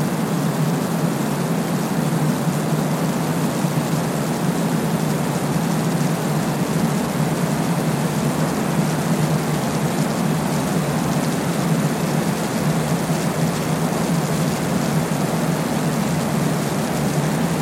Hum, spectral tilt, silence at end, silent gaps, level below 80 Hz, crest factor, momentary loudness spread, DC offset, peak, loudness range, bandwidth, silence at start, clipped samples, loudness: none; -5.5 dB/octave; 0 s; none; -48 dBFS; 14 dB; 1 LU; under 0.1%; -6 dBFS; 0 LU; 16.5 kHz; 0 s; under 0.1%; -21 LUFS